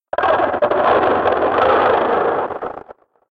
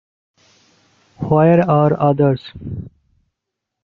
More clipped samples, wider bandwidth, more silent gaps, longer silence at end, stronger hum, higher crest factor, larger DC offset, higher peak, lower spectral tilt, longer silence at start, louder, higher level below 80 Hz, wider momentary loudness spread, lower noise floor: neither; about the same, 6.2 kHz vs 5.8 kHz; neither; second, 0.4 s vs 0.95 s; neither; about the same, 14 dB vs 16 dB; neither; about the same, -2 dBFS vs -2 dBFS; second, -7 dB/octave vs -10 dB/octave; second, 0.15 s vs 1.2 s; about the same, -16 LUFS vs -15 LUFS; about the same, -50 dBFS vs -50 dBFS; second, 12 LU vs 18 LU; second, -42 dBFS vs -80 dBFS